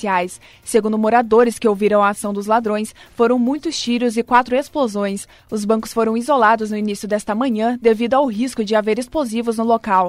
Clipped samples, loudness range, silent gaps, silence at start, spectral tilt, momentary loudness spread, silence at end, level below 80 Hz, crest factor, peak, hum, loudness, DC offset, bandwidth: under 0.1%; 2 LU; none; 0 s; -5 dB/octave; 8 LU; 0 s; -52 dBFS; 16 dB; 0 dBFS; none; -18 LUFS; under 0.1%; 15.5 kHz